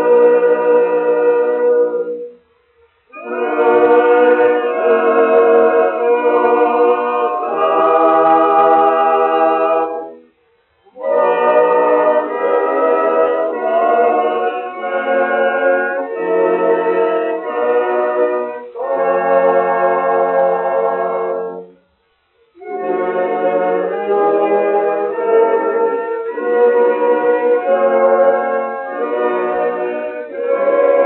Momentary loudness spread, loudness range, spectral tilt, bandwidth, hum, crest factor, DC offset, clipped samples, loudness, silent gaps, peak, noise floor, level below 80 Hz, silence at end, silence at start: 10 LU; 4 LU; -3 dB/octave; 4.1 kHz; none; 14 dB; under 0.1%; under 0.1%; -14 LUFS; none; 0 dBFS; -60 dBFS; -68 dBFS; 0 s; 0 s